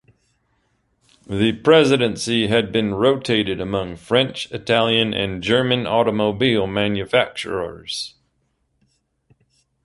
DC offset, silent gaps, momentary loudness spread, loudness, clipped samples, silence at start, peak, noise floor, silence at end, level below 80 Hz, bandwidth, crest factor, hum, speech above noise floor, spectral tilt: under 0.1%; none; 12 LU; -19 LUFS; under 0.1%; 1.3 s; -2 dBFS; -68 dBFS; 1.75 s; -50 dBFS; 11.5 kHz; 18 dB; none; 49 dB; -5 dB/octave